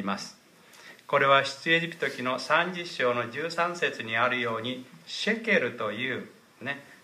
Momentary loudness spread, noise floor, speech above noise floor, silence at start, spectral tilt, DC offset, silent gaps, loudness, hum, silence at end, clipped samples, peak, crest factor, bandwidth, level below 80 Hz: 13 LU; -52 dBFS; 24 dB; 0 s; -4 dB/octave; under 0.1%; none; -27 LUFS; none; 0.1 s; under 0.1%; -8 dBFS; 20 dB; 15.5 kHz; -78 dBFS